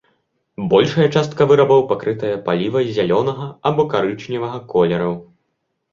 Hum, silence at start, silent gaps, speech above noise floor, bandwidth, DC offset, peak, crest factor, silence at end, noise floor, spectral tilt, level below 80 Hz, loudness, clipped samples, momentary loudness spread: none; 0.6 s; none; 55 dB; 7.4 kHz; under 0.1%; -2 dBFS; 16 dB; 0.7 s; -72 dBFS; -7 dB/octave; -54 dBFS; -17 LUFS; under 0.1%; 11 LU